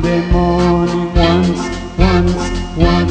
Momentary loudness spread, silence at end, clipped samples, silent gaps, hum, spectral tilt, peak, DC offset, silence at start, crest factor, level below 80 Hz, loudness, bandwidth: 7 LU; 0 s; under 0.1%; none; none; -6.5 dB/octave; 0 dBFS; under 0.1%; 0 s; 12 dB; -20 dBFS; -14 LUFS; 9 kHz